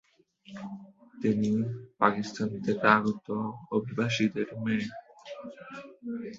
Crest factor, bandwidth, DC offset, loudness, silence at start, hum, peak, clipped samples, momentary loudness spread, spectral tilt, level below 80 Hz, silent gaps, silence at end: 24 dB; 7.6 kHz; under 0.1%; -29 LUFS; 0.5 s; none; -6 dBFS; under 0.1%; 19 LU; -6 dB/octave; -66 dBFS; none; 0 s